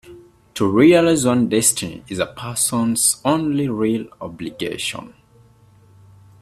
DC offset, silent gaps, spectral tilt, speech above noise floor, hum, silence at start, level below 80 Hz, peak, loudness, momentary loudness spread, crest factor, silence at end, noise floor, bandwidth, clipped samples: under 0.1%; none; -4 dB/octave; 33 dB; none; 0.05 s; -54 dBFS; 0 dBFS; -18 LUFS; 16 LU; 20 dB; 1.35 s; -51 dBFS; 15.5 kHz; under 0.1%